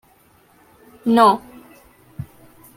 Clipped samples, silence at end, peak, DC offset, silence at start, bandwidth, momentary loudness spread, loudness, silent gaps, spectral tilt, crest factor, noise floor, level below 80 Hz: under 0.1%; 0.55 s; -2 dBFS; under 0.1%; 1.05 s; 16.5 kHz; 25 LU; -16 LUFS; none; -6 dB/octave; 20 dB; -55 dBFS; -58 dBFS